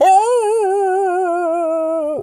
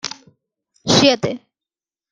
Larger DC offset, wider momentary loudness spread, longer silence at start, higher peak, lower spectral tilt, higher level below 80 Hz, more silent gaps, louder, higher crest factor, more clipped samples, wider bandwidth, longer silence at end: neither; second, 6 LU vs 20 LU; about the same, 0 s vs 0.05 s; about the same, -4 dBFS vs -2 dBFS; about the same, -3.5 dB/octave vs -3.5 dB/octave; second, -66 dBFS vs -54 dBFS; neither; about the same, -16 LUFS vs -15 LUFS; second, 12 dB vs 20 dB; neither; first, 12.5 kHz vs 10.5 kHz; second, 0 s vs 0.75 s